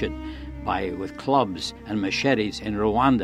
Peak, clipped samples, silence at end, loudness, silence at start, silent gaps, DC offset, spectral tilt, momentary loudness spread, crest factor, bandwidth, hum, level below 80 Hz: -6 dBFS; under 0.1%; 0 s; -25 LUFS; 0 s; none; under 0.1%; -5.5 dB/octave; 11 LU; 20 dB; 12.5 kHz; none; -42 dBFS